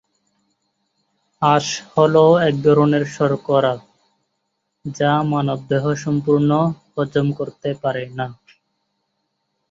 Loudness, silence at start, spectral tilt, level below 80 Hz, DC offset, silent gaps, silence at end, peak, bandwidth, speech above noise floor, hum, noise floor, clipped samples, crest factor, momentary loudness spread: -18 LUFS; 1.4 s; -6.5 dB/octave; -58 dBFS; under 0.1%; none; 1.4 s; -2 dBFS; 7.8 kHz; 56 dB; none; -73 dBFS; under 0.1%; 18 dB; 11 LU